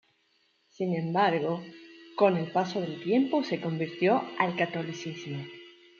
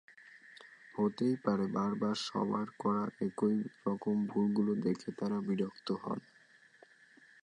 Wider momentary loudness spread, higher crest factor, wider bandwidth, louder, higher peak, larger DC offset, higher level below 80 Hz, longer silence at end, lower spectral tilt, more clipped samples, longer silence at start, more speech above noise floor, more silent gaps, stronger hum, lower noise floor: first, 14 LU vs 11 LU; about the same, 20 dB vs 18 dB; second, 7.2 kHz vs 10 kHz; first, -29 LUFS vs -35 LUFS; first, -8 dBFS vs -18 dBFS; neither; about the same, -78 dBFS vs -76 dBFS; second, 0.3 s vs 1.25 s; about the same, -6.5 dB/octave vs -7 dB/octave; neither; first, 0.8 s vs 0.25 s; first, 42 dB vs 30 dB; neither; neither; first, -70 dBFS vs -64 dBFS